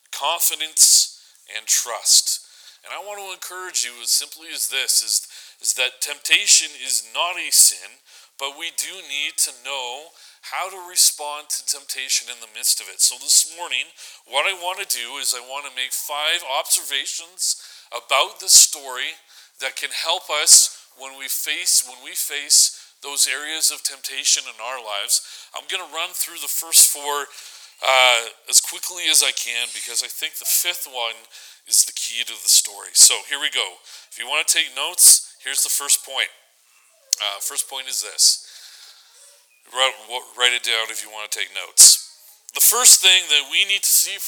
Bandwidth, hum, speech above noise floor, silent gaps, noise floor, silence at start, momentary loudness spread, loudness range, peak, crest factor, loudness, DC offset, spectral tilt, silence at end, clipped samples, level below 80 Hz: over 20 kHz; none; 37 dB; none; -57 dBFS; 0.1 s; 18 LU; 7 LU; 0 dBFS; 20 dB; -17 LUFS; under 0.1%; 4.5 dB/octave; 0 s; under 0.1%; -76 dBFS